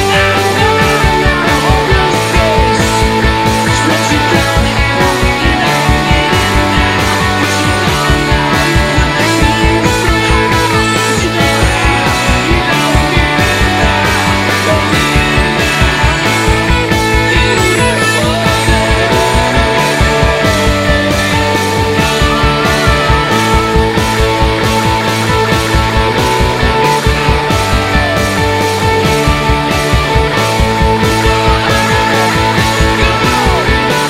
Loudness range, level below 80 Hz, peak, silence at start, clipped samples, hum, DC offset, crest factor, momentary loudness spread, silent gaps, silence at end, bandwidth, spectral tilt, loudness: 1 LU; -18 dBFS; 0 dBFS; 0 s; 0.1%; none; 0.5%; 10 dB; 2 LU; none; 0 s; 16.5 kHz; -4.5 dB/octave; -10 LUFS